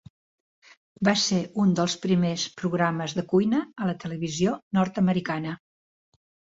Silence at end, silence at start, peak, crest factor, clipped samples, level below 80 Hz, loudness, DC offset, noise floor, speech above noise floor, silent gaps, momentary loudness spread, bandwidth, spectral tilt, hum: 1 s; 1 s; -8 dBFS; 18 dB; under 0.1%; -62 dBFS; -25 LUFS; under 0.1%; under -90 dBFS; over 65 dB; 4.63-4.71 s; 8 LU; 8 kHz; -5 dB/octave; none